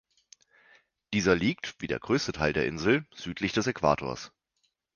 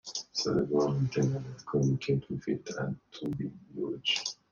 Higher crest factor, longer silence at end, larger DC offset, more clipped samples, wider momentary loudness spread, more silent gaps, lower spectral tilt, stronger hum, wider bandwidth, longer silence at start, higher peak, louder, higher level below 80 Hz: first, 22 dB vs 16 dB; first, 0.7 s vs 0.2 s; neither; neither; about the same, 11 LU vs 9 LU; neither; about the same, -5 dB/octave vs -5.5 dB/octave; neither; first, 10 kHz vs 7.4 kHz; first, 1.1 s vs 0.05 s; first, -8 dBFS vs -16 dBFS; first, -28 LUFS vs -32 LUFS; first, -52 dBFS vs -62 dBFS